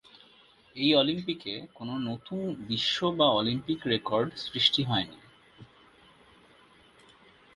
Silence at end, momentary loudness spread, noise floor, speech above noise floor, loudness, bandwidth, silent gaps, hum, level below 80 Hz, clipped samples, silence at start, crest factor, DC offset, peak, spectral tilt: 1.9 s; 13 LU; -59 dBFS; 31 dB; -28 LUFS; 11.5 kHz; none; none; -64 dBFS; under 0.1%; 0.75 s; 24 dB; under 0.1%; -8 dBFS; -5.5 dB/octave